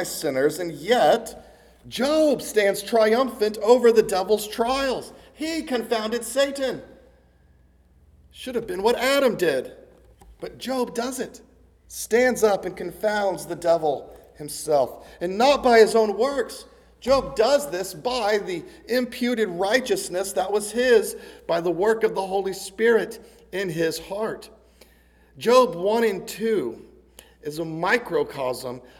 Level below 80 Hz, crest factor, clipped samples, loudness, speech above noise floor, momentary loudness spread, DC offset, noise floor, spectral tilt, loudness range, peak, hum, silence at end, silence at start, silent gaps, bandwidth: -54 dBFS; 20 dB; under 0.1%; -23 LUFS; 34 dB; 15 LU; under 0.1%; -57 dBFS; -3.5 dB/octave; 6 LU; -2 dBFS; none; 0.15 s; 0 s; none; 18.5 kHz